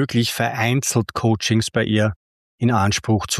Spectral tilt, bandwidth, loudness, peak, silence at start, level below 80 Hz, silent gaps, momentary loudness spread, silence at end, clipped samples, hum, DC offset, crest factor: -4.5 dB/octave; 14.5 kHz; -20 LUFS; -4 dBFS; 0 s; -48 dBFS; 2.16-2.58 s; 3 LU; 0 s; under 0.1%; none; under 0.1%; 14 dB